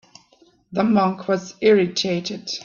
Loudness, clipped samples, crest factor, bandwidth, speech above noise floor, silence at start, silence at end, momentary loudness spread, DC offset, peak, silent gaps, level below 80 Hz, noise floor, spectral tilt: -20 LUFS; under 0.1%; 16 dB; 7.4 kHz; 37 dB; 0.7 s; 0 s; 9 LU; under 0.1%; -4 dBFS; none; -64 dBFS; -57 dBFS; -5 dB/octave